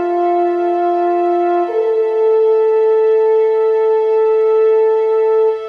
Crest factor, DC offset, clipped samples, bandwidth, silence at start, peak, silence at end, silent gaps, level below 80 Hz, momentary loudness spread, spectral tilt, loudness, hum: 6 dB; under 0.1%; under 0.1%; 4.9 kHz; 0 s; -6 dBFS; 0 s; none; -66 dBFS; 3 LU; -5.5 dB/octave; -14 LUFS; none